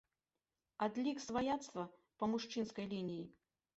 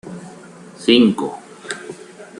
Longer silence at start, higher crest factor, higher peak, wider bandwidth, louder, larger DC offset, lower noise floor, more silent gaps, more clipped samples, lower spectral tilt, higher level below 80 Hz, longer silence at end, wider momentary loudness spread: first, 0.8 s vs 0.05 s; about the same, 18 dB vs 18 dB; second, -24 dBFS vs -2 dBFS; second, 8 kHz vs 11 kHz; second, -42 LUFS vs -16 LUFS; neither; first, under -90 dBFS vs -40 dBFS; neither; neither; about the same, -4.5 dB/octave vs -5 dB/octave; second, -74 dBFS vs -60 dBFS; first, 0.45 s vs 0.15 s; second, 11 LU vs 24 LU